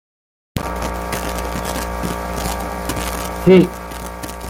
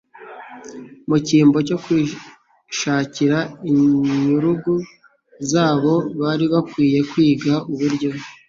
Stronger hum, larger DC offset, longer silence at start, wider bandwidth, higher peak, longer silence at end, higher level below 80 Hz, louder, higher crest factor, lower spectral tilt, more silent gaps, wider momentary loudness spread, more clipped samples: neither; neither; first, 0.55 s vs 0.2 s; first, 17 kHz vs 7.6 kHz; about the same, -2 dBFS vs -4 dBFS; second, 0 s vs 0.15 s; first, -30 dBFS vs -56 dBFS; about the same, -20 LUFS vs -18 LUFS; about the same, 18 dB vs 16 dB; about the same, -5.5 dB/octave vs -6 dB/octave; neither; second, 16 LU vs 20 LU; neither